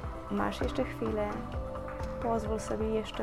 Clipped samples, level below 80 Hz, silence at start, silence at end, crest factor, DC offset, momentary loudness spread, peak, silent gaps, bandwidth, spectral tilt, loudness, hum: under 0.1%; -42 dBFS; 0 s; 0 s; 14 dB; under 0.1%; 6 LU; -18 dBFS; none; 15 kHz; -6.5 dB/octave; -34 LUFS; none